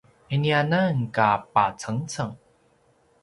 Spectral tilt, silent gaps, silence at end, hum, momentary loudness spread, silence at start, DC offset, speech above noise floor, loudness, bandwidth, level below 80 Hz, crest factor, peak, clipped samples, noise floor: -6 dB/octave; none; 0.85 s; none; 10 LU; 0.3 s; under 0.1%; 39 dB; -24 LUFS; 11.5 kHz; -60 dBFS; 20 dB; -4 dBFS; under 0.1%; -62 dBFS